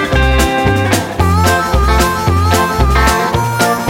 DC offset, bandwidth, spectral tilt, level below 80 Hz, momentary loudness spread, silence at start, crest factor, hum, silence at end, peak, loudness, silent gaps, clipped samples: under 0.1%; 17 kHz; -5 dB/octave; -18 dBFS; 2 LU; 0 s; 12 dB; none; 0 s; 0 dBFS; -12 LUFS; none; under 0.1%